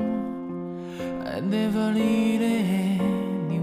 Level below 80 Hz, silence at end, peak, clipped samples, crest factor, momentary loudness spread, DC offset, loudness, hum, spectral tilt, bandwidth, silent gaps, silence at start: -58 dBFS; 0 s; -12 dBFS; under 0.1%; 12 dB; 11 LU; under 0.1%; -26 LUFS; none; -7 dB/octave; 15 kHz; none; 0 s